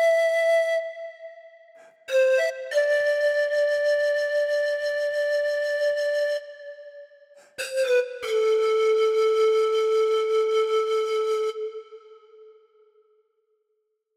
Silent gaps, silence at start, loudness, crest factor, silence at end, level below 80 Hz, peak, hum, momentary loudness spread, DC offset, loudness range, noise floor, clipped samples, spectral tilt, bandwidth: none; 0 s; -23 LUFS; 12 dB; 1.75 s; -80 dBFS; -12 dBFS; none; 14 LU; under 0.1%; 5 LU; -75 dBFS; under 0.1%; 0.5 dB/octave; 14 kHz